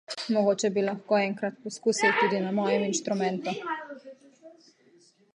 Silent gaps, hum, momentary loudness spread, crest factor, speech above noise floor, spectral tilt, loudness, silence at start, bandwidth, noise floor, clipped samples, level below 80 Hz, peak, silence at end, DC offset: none; none; 11 LU; 18 dB; 34 dB; -4 dB/octave; -27 LUFS; 0.1 s; 11 kHz; -61 dBFS; under 0.1%; -80 dBFS; -10 dBFS; 0.85 s; under 0.1%